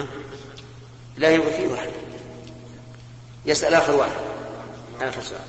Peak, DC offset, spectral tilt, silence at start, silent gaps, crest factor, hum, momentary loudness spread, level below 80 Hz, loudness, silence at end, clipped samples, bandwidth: -2 dBFS; under 0.1%; -4 dB/octave; 0 s; none; 22 dB; none; 25 LU; -52 dBFS; -22 LUFS; 0 s; under 0.1%; 8.8 kHz